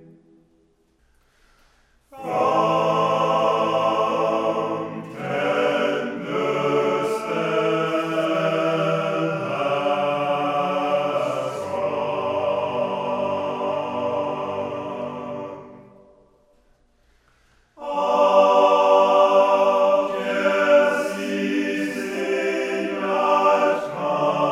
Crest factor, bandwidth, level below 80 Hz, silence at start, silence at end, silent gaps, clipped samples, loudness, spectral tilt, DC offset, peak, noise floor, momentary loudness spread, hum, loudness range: 18 dB; 12.5 kHz; -66 dBFS; 2.1 s; 0 s; none; under 0.1%; -21 LUFS; -5.5 dB/octave; under 0.1%; -4 dBFS; -62 dBFS; 11 LU; none; 10 LU